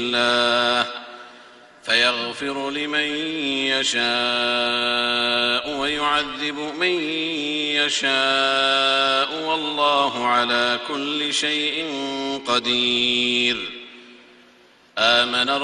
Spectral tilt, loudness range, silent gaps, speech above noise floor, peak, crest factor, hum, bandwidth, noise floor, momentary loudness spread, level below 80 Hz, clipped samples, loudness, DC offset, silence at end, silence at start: -2 dB/octave; 3 LU; none; 31 dB; -2 dBFS; 20 dB; none; 11.5 kHz; -53 dBFS; 9 LU; -60 dBFS; under 0.1%; -20 LUFS; under 0.1%; 0 s; 0 s